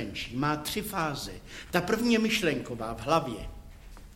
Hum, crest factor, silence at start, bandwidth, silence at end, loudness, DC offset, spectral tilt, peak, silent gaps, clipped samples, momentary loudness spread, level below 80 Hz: none; 24 dB; 0 s; 16.5 kHz; 0 s; -29 LUFS; under 0.1%; -4.5 dB/octave; -6 dBFS; none; under 0.1%; 15 LU; -48 dBFS